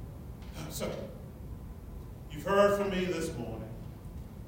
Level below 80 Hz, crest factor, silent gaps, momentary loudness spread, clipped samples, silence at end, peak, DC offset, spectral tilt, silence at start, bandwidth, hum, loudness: -48 dBFS; 20 dB; none; 20 LU; under 0.1%; 0 s; -14 dBFS; under 0.1%; -5.5 dB/octave; 0 s; 16 kHz; none; -32 LUFS